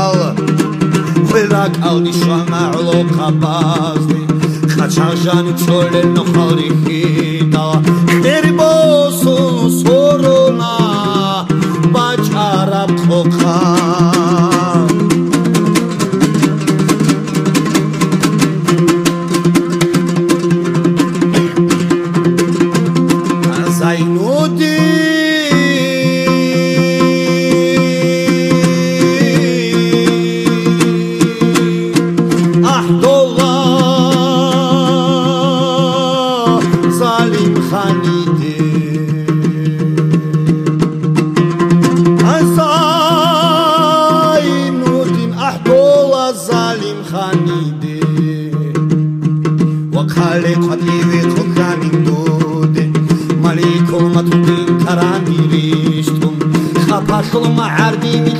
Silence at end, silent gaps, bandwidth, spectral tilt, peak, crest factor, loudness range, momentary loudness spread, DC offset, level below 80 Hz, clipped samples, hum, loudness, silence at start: 0 s; none; 15.5 kHz; -6 dB/octave; 0 dBFS; 12 dB; 3 LU; 4 LU; under 0.1%; -48 dBFS; under 0.1%; none; -12 LUFS; 0 s